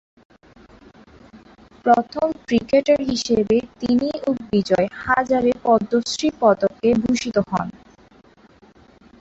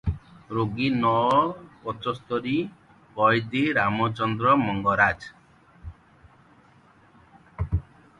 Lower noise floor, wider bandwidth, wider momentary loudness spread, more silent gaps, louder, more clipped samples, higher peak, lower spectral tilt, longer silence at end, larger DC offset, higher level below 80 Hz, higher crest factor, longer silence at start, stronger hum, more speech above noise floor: second, -51 dBFS vs -56 dBFS; second, 8 kHz vs 11 kHz; second, 6 LU vs 18 LU; neither; first, -20 LUFS vs -24 LUFS; neither; about the same, -2 dBFS vs -4 dBFS; second, -5 dB/octave vs -7.5 dB/octave; first, 1.5 s vs 0.4 s; neither; second, -52 dBFS vs -44 dBFS; about the same, 18 dB vs 22 dB; first, 1.35 s vs 0.05 s; neither; about the same, 32 dB vs 33 dB